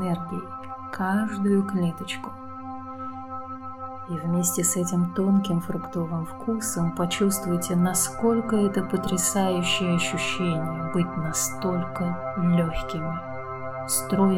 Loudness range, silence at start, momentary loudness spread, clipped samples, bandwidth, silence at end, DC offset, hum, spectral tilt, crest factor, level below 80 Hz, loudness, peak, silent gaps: 5 LU; 0 s; 13 LU; under 0.1%; 17 kHz; 0 s; 0.3%; none; -4.5 dB/octave; 16 dB; -50 dBFS; -25 LUFS; -10 dBFS; none